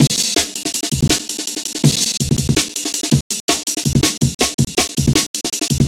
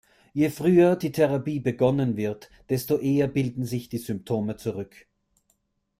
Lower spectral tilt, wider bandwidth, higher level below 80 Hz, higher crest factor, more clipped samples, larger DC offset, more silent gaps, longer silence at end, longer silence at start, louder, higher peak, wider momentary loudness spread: second, -3.5 dB/octave vs -7.5 dB/octave; about the same, 16.5 kHz vs 16 kHz; first, -34 dBFS vs -58 dBFS; about the same, 18 dB vs 18 dB; neither; neither; first, 3.21-3.30 s, 3.40-3.48 s, 4.35-4.39 s, 4.54-4.58 s, 5.27-5.34 s vs none; second, 0 s vs 1.15 s; second, 0 s vs 0.35 s; first, -17 LUFS vs -25 LUFS; first, 0 dBFS vs -8 dBFS; second, 5 LU vs 12 LU